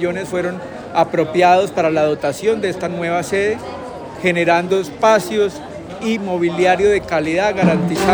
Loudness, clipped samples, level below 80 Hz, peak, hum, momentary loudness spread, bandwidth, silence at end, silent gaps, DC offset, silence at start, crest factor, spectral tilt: -17 LUFS; under 0.1%; -48 dBFS; 0 dBFS; none; 11 LU; over 20 kHz; 0 s; none; under 0.1%; 0 s; 16 dB; -5.5 dB/octave